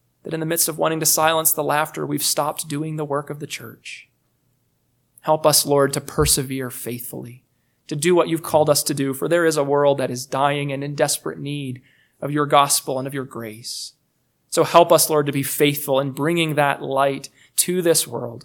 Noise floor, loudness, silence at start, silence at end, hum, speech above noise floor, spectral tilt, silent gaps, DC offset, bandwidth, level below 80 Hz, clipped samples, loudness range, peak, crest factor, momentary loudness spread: -68 dBFS; -19 LUFS; 0.25 s; 0 s; none; 48 dB; -3.5 dB/octave; none; under 0.1%; 19 kHz; -48 dBFS; under 0.1%; 4 LU; 0 dBFS; 20 dB; 16 LU